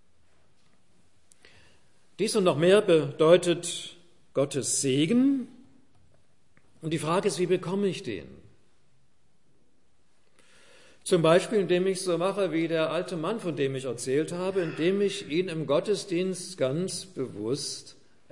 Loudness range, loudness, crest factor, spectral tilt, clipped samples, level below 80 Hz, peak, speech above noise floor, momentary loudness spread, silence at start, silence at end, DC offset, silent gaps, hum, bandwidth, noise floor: 7 LU; -27 LUFS; 22 dB; -5 dB/octave; under 0.1%; -72 dBFS; -6 dBFS; 44 dB; 12 LU; 2.2 s; 0.4 s; 0.2%; none; none; 11.5 kHz; -70 dBFS